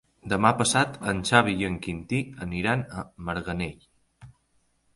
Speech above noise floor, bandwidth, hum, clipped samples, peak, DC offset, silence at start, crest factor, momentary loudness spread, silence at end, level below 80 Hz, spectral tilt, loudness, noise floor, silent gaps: 43 dB; 11.5 kHz; none; under 0.1%; -2 dBFS; under 0.1%; 0.25 s; 24 dB; 12 LU; 0.65 s; -50 dBFS; -4.5 dB/octave; -26 LUFS; -69 dBFS; none